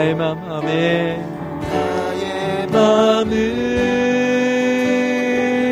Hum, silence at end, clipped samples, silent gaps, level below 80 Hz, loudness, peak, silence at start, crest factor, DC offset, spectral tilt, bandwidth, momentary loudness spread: none; 0 s; under 0.1%; none; -44 dBFS; -18 LUFS; -2 dBFS; 0 s; 14 dB; under 0.1%; -5.5 dB/octave; 15.5 kHz; 8 LU